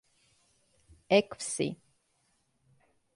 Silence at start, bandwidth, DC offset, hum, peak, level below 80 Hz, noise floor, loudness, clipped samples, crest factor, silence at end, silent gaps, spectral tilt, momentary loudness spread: 1.1 s; 11.5 kHz; under 0.1%; none; -12 dBFS; -70 dBFS; -74 dBFS; -30 LUFS; under 0.1%; 24 dB; 1.4 s; none; -4 dB/octave; 10 LU